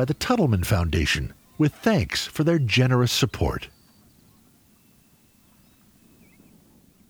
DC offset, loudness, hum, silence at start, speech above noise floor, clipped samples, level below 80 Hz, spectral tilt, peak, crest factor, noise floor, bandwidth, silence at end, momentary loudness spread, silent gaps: under 0.1%; -23 LUFS; none; 0 s; 36 dB; under 0.1%; -40 dBFS; -5.5 dB/octave; -8 dBFS; 16 dB; -58 dBFS; over 20 kHz; 3.45 s; 8 LU; none